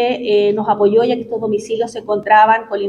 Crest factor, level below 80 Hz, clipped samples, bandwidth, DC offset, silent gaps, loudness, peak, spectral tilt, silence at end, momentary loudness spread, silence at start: 14 dB; -58 dBFS; under 0.1%; 10.5 kHz; under 0.1%; none; -15 LUFS; 0 dBFS; -5.5 dB/octave; 0 s; 10 LU; 0 s